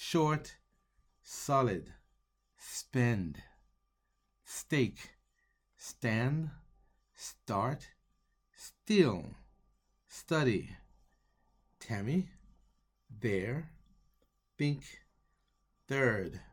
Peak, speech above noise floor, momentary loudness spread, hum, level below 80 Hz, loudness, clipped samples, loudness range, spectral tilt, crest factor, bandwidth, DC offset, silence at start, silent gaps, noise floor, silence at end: -12 dBFS; 46 dB; 21 LU; none; -62 dBFS; -34 LUFS; under 0.1%; 5 LU; -5.5 dB/octave; 24 dB; 18 kHz; under 0.1%; 0 s; none; -79 dBFS; 0.1 s